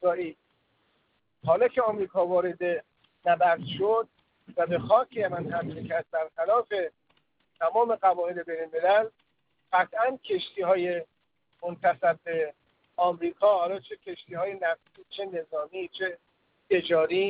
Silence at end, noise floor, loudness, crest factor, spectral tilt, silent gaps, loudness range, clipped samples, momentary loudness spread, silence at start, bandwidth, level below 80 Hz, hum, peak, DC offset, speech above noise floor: 0 s; -74 dBFS; -27 LUFS; 20 dB; -9 dB/octave; none; 3 LU; under 0.1%; 13 LU; 0 s; 5 kHz; -72 dBFS; none; -8 dBFS; under 0.1%; 48 dB